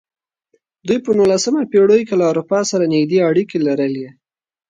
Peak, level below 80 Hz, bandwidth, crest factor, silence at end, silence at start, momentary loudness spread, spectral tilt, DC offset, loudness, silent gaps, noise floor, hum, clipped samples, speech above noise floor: -2 dBFS; -60 dBFS; 9.4 kHz; 14 dB; 0.6 s; 0.85 s; 8 LU; -5.5 dB/octave; under 0.1%; -15 LUFS; none; -64 dBFS; none; under 0.1%; 49 dB